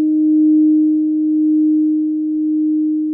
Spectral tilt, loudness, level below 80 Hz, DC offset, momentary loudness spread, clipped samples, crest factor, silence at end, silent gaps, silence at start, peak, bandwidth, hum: -14.5 dB/octave; -15 LUFS; -62 dBFS; under 0.1%; 6 LU; under 0.1%; 6 dB; 0 s; none; 0 s; -8 dBFS; 0.7 kHz; none